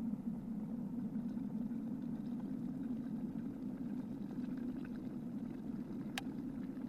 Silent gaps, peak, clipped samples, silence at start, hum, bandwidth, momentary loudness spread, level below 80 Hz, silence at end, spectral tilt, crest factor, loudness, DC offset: none; -18 dBFS; under 0.1%; 0 s; none; 13.5 kHz; 3 LU; -66 dBFS; 0 s; -7 dB/octave; 24 dB; -43 LUFS; under 0.1%